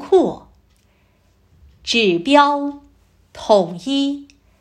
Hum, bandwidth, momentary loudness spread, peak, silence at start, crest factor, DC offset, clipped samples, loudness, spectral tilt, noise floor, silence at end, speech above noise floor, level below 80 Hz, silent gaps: none; 10.5 kHz; 18 LU; 0 dBFS; 0 s; 18 dB; under 0.1%; under 0.1%; -17 LUFS; -4.5 dB/octave; -57 dBFS; 0.35 s; 42 dB; -54 dBFS; none